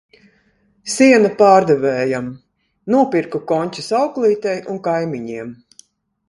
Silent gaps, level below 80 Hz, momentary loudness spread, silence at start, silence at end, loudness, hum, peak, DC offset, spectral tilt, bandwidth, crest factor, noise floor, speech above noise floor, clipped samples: none; -60 dBFS; 18 LU; 0.85 s; 0.75 s; -16 LUFS; none; 0 dBFS; under 0.1%; -5 dB/octave; 11.5 kHz; 18 dB; -59 dBFS; 43 dB; under 0.1%